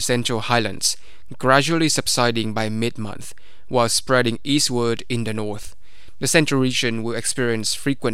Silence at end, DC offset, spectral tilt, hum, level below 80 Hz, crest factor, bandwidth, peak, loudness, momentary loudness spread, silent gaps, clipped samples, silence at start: 0 s; 4%; -3.5 dB/octave; none; -50 dBFS; 22 dB; 16 kHz; 0 dBFS; -20 LUFS; 11 LU; none; under 0.1%; 0 s